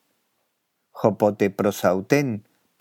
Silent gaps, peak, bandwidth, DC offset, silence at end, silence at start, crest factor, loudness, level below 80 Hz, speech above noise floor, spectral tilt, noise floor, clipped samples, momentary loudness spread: none; -2 dBFS; 17 kHz; under 0.1%; 0.4 s; 0.95 s; 22 dB; -22 LUFS; -72 dBFS; 53 dB; -6.5 dB/octave; -74 dBFS; under 0.1%; 6 LU